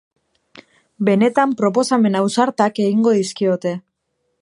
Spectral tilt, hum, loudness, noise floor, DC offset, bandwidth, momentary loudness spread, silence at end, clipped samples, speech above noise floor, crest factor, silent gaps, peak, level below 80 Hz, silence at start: -5.5 dB/octave; none; -17 LUFS; -71 dBFS; under 0.1%; 11.5 kHz; 7 LU; 0.65 s; under 0.1%; 55 dB; 18 dB; none; 0 dBFS; -68 dBFS; 0.55 s